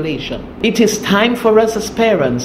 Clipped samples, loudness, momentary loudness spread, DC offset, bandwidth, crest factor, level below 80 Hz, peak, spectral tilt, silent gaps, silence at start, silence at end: under 0.1%; -14 LUFS; 9 LU; under 0.1%; 15.5 kHz; 14 dB; -40 dBFS; 0 dBFS; -4.5 dB/octave; none; 0 s; 0 s